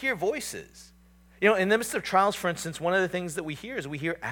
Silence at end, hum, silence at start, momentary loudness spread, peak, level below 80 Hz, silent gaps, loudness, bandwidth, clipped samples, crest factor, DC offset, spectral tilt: 0 s; none; 0 s; 11 LU; -8 dBFS; -60 dBFS; none; -27 LUFS; 19 kHz; under 0.1%; 20 dB; under 0.1%; -4 dB/octave